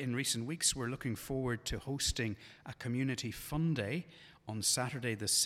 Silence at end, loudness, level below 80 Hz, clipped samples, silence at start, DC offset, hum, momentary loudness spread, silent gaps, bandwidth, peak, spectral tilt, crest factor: 0 s; -36 LUFS; -54 dBFS; under 0.1%; 0 s; under 0.1%; none; 13 LU; none; 16.5 kHz; -18 dBFS; -3.5 dB/octave; 18 dB